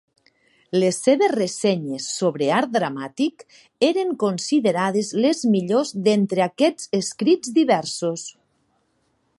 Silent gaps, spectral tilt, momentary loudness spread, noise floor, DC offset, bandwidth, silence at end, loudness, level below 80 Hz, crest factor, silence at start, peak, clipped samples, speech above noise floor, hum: none; -5 dB/octave; 7 LU; -67 dBFS; under 0.1%; 11.5 kHz; 1.1 s; -21 LUFS; -72 dBFS; 18 dB; 0.75 s; -4 dBFS; under 0.1%; 47 dB; none